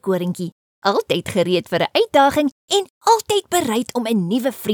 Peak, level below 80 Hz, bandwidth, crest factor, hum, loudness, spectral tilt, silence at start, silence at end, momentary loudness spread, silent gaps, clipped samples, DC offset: -2 dBFS; -56 dBFS; over 20 kHz; 16 dB; none; -19 LUFS; -4.5 dB/octave; 0.05 s; 0 s; 7 LU; 0.52-0.82 s, 2.52-2.68 s, 2.90-3.01 s; under 0.1%; under 0.1%